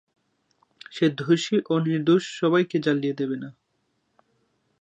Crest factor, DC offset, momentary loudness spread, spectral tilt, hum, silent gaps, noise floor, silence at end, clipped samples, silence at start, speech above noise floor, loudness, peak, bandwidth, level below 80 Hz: 18 dB; under 0.1%; 9 LU; -6 dB/octave; none; none; -73 dBFS; 1.3 s; under 0.1%; 0.9 s; 50 dB; -23 LUFS; -8 dBFS; 8.6 kHz; -76 dBFS